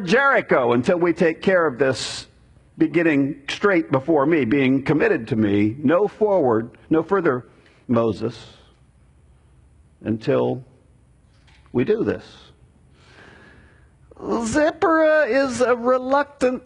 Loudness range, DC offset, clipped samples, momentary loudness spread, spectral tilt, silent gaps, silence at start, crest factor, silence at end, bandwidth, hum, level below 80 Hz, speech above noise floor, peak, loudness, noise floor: 9 LU; under 0.1%; under 0.1%; 10 LU; -6 dB/octave; none; 0 s; 16 dB; 0.05 s; 11 kHz; none; -54 dBFS; 35 dB; -4 dBFS; -20 LUFS; -54 dBFS